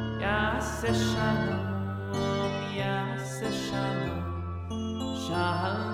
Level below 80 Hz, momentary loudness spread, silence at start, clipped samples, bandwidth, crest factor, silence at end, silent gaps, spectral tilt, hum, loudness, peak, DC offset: -46 dBFS; 7 LU; 0 s; under 0.1%; 16 kHz; 16 dB; 0 s; none; -5.5 dB/octave; none; -30 LUFS; -14 dBFS; under 0.1%